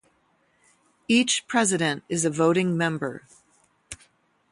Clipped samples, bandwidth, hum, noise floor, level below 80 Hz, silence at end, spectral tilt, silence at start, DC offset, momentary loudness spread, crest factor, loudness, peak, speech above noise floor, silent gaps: under 0.1%; 11.5 kHz; none; -66 dBFS; -64 dBFS; 0.55 s; -4 dB/octave; 1.1 s; under 0.1%; 22 LU; 18 dB; -23 LUFS; -8 dBFS; 43 dB; none